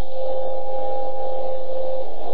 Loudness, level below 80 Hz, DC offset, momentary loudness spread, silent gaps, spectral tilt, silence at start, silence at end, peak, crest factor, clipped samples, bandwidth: -28 LUFS; -50 dBFS; 30%; 1 LU; none; -9 dB/octave; 0 s; 0 s; -8 dBFS; 10 dB; under 0.1%; 4.9 kHz